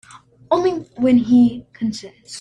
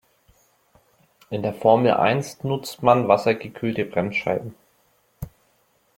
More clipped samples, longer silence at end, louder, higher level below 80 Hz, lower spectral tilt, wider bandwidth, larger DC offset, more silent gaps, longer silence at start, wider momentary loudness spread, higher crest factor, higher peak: neither; second, 0 s vs 0.7 s; first, -18 LUFS vs -21 LUFS; about the same, -54 dBFS vs -58 dBFS; about the same, -6.5 dB/octave vs -6.5 dB/octave; second, 10 kHz vs 16.5 kHz; neither; neither; second, 0.5 s vs 1.3 s; second, 14 LU vs 23 LU; second, 16 dB vs 22 dB; about the same, -4 dBFS vs -2 dBFS